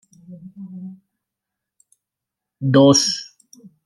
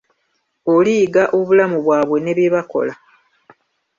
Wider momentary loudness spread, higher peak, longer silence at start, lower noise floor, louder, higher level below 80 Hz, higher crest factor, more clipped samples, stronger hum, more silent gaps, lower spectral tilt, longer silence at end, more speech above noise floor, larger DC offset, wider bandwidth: first, 26 LU vs 8 LU; about the same, -2 dBFS vs -4 dBFS; second, 0.3 s vs 0.65 s; first, -85 dBFS vs -68 dBFS; about the same, -16 LUFS vs -16 LUFS; about the same, -64 dBFS vs -62 dBFS; first, 20 dB vs 14 dB; neither; neither; neither; second, -4.5 dB/octave vs -6.5 dB/octave; second, 0.6 s vs 1.05 s; first, 67 dB vs 53 dB; neither; first, 13.5 kHz vs 7.4 kHz